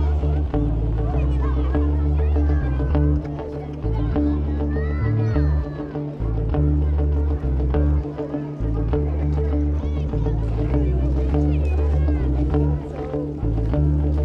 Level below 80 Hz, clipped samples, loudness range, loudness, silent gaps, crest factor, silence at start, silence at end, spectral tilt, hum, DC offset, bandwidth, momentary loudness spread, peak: -22 dBFS; under 0.1%; 1 LU; -22 LUFS; none; 14 dB; 0 s; 0 s; -10.5 dB/octave; none; under 0.1%; 4.4 kHz; 6 LU; -6 dBFS